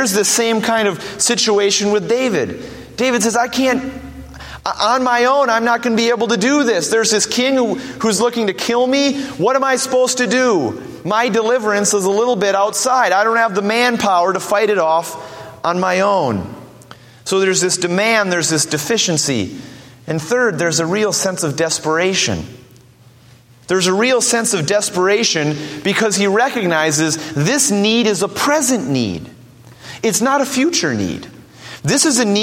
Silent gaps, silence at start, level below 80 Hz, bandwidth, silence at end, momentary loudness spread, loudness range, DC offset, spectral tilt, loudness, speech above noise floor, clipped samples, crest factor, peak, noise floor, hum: none; 0 s; -52 dBFS; 16.5 kHz; 0 s; 10 LU; 3 LU; under 0.1%; -3 dB/octave; -15 LUFS; 30 dB; under 0.1%; 16 dB; 0 dBFS; -45 dBFS; none